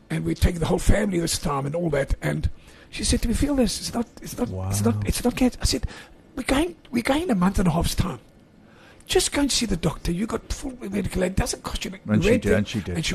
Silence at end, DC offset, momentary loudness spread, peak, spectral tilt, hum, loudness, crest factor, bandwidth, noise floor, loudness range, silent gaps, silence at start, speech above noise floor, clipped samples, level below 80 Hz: 0 s; under 0.1%; 9 LU; -6 dBFS; -5 dB/octave; none; -24 LUFS; 18 dB; 13 kHz; -51 dBFS; 2 LU; none; 0.1 s; 28 dB; under 0.1%; -32 dBFS